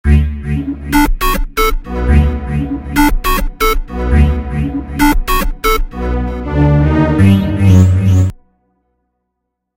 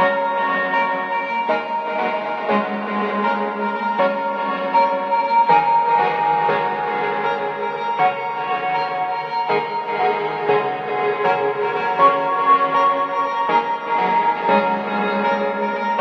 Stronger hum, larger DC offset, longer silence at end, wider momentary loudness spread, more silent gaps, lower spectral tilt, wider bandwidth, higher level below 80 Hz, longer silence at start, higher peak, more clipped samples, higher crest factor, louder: neither; neither; first, 1.4 s vs 0 s; about the same, 9 LU vs 7 LU; neither; about the same, -6.5 dB/octave vs -6.5 dB/octave; first, 16.5 kHz vs 6.4 kHz; first, -16 dBFS vs -80 dBFS; about the same, 0.05 s vs 0 s; about the same, 0 dBFS vs -2 dBFS; first, 0.1% vs under 0.1%; second, 12 dB vs 18 dB; first, -13 LUFS vs -19 LUFS